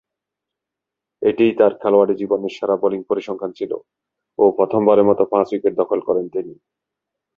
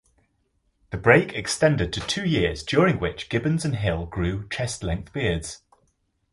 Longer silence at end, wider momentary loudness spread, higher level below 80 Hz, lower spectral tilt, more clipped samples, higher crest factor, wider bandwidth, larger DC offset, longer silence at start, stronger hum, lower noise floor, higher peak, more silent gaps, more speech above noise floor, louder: about the same, 0.85 s vs 0.75 s; about the same, 13 LU vs 11 LU; second, -62 dBFS vs -40 dBFS; first, -8 dB/octave vs -5 dB/octave; neither; second, 16 dB vs 22 dB; second, 6.8 kHz vs 11.5 kHz; neither; first, 1.2 s vs 0.9 s; neither; first, -84 dBFS vs -70 dBFS; about the same, -2 dBFS vs -2 dBFS; neither; first, 67 dB vs 46 dB; first, -18 LUFS vs -23 LUFS